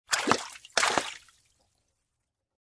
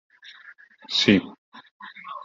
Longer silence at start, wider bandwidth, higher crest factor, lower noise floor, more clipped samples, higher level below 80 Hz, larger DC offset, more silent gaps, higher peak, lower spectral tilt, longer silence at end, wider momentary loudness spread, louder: second, 0.1 s vs 0.9 s; first, 11 kHz vs 7.6 kHz; first, 30 dB vs 22 dB; first, -83 dBFS vs -50 dBFS; neither; second, -68 dBFS vs -62 dBFS; neither; second, none vs 1.38-1.52 s, 1.71-1.80 s; about the same, -4 dBFS vs -4 dBFS; second, -1 dB/octave vs -4.5 dB/octave; first, 1.45 s vs 0.05 s; second, 13 LU vs 26 LU; second, -28 LUFS vs -21 LUFS